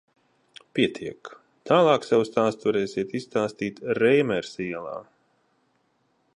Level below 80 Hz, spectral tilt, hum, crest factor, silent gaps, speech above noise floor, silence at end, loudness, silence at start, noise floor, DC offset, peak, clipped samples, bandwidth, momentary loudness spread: -66 dBFS; -6 dB/octave; none; 20 dB; none; 45 dB; 1.35 s; -24 LUFS; 0.75 s; -69 dBFS; under 0.1%; -6 dBFS; under 0.1%; 11 kHz; 17 LU